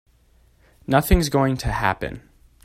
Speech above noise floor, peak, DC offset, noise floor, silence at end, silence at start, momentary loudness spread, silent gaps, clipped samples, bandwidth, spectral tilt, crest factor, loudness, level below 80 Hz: 37 dB; -4 dBFS; under 0.1%; -57 dBFS; 0.45 s; 0.9 s; 17 LU; none; under 0.1%; 16 kHz; -5.5 dB/octave; 20 dB; -21 LUFS; -30 dBFS